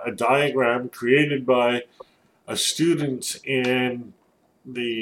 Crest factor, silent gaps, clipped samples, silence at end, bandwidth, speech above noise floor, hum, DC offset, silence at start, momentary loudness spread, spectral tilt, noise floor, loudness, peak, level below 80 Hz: 18 dB; none; under 0.1%; 0 s; 16.5 kHz; 38 dB; none; under 0.1%; 0 s; 9 LU; -4 dB/octave; -60 dBFS; -22 LUFS; -6 dBFS; -70 dBFS